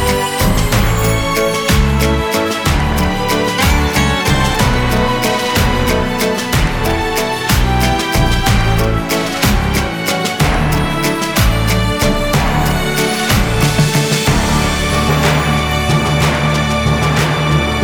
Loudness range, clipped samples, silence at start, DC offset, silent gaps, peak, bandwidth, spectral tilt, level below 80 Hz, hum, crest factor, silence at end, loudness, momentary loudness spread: 1 LU; under 0.1%; 0 s; under 0.1%; none; 0 dBFS; over 20 kHz; -4.5 dB/octave; -20 dBFS; none; 12 dB; 0 s; -14 LUFS; 3 LU